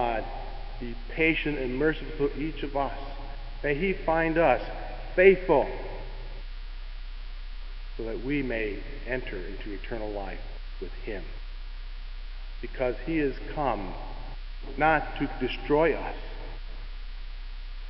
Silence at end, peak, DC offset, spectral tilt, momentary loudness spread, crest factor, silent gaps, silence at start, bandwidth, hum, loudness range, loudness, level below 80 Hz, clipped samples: 0 s; -4 dBFS; under 0.1%; -9.5 dB/octave; 19 LU; 24 dB; none; 0 s; 5.8 kHz; none; 11 LU; -28 LUFS; -36 dBFS; under 0.1%